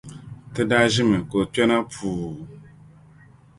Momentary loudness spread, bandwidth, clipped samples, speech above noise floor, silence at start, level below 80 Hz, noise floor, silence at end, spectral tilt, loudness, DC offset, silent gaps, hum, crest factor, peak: 21 LU; 11.5 kHz; under 0.1%; 29 dB; 0.05 s; -50 dBFS; -50 dBFS; 0.95 s; -5 dB/octave; -21 LUFS; under 0.1%; none; none; 20 dB; -4 dBFS